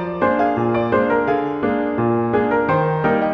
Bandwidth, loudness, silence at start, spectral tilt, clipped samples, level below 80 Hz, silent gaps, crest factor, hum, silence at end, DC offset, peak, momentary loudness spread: 6.2 kHz; -18 LUFS; 0 s; -9.5 dB/octave; under 0.1%; -48 dBFS; none; 14 dB; none; 0 s; under 0.1%; -4 dBFS; 3 LU